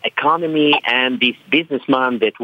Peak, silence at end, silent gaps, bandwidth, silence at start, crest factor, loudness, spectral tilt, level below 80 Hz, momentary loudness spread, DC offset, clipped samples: -2 dBFS; 0 s; none; 6.2 kHz; 0.05 s; 14 dB; -16 LUFS; -6 dB/octave; -68 dBFS; 4 LU; under 0.1%; under 0.1%